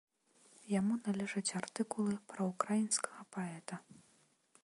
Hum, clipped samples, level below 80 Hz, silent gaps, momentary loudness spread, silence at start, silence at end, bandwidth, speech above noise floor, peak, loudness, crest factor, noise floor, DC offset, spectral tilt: none; under 0.1%; -80 dBFS; none; 10 LU; 0.65 s; 0.7 s; 11.5 kHz; 34 dB; -16 dBFS; -38 LUFS; 24 dB; -72 dBFS; under 0.1%; -4.5 dB/octave